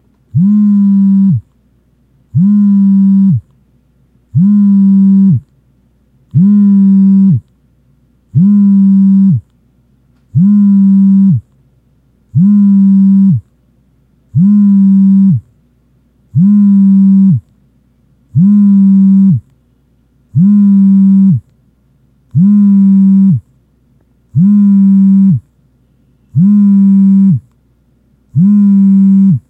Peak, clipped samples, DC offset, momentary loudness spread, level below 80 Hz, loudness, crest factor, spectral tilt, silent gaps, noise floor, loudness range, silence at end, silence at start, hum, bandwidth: 0 dBFS; under 0.1%; under 0.1%; 10 LU; -50 dBFS; -8 LUFS; 8 dB; -13 dB/octave; none; -51 dBFS; 3 LU; 0.1 s; 0.35 s; none; 1.4 kHz